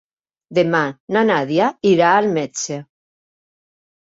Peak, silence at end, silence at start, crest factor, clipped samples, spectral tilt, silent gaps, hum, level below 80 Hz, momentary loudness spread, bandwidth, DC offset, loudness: -2 dBFS; 1.2 s; 0.5 s; 18 dB; under 0.1%; -5 dB/octave; 1.00-1.08 s; none; -64 dBFS; 11 LU; 8 kHz; under 0.1%; -17 LUFS